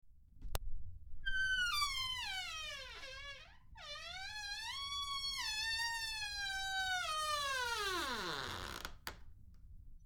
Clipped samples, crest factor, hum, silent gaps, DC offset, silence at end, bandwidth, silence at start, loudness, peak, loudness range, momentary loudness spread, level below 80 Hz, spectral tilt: under 0.1%; 24 dB; none; none; under 0.1%; 0 s; over 20 kHz; 0.05 s; -39 LUFS; -18 dBFS; 5 LU; 15 LU; -52 dBFS; -1 dB/octave